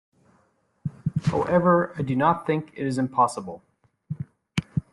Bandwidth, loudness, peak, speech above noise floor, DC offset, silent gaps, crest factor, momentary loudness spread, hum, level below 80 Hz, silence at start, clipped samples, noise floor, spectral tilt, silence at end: 11.5 kHz; -24 LUFS; -6 dBFS; 43 dB; under 0.1%; none; 20 dB; 16 LU; none; -56 dBFS; 0.85 s; under 0.1%; -66 dBFS; -7 dB/octave; 0.1 s